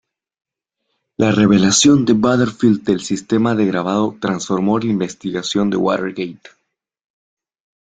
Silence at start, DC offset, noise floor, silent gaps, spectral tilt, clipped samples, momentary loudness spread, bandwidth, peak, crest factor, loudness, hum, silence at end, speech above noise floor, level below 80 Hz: 1.2 s; under 0.1%; -74 dBFS; none; -5 dB/octave; under 0.1%; 11 LU; 9.4 kHz; -2 dBFS; 16 dB; -16 LUFS; none; 1.5 s; 59 dB; -52 dBFS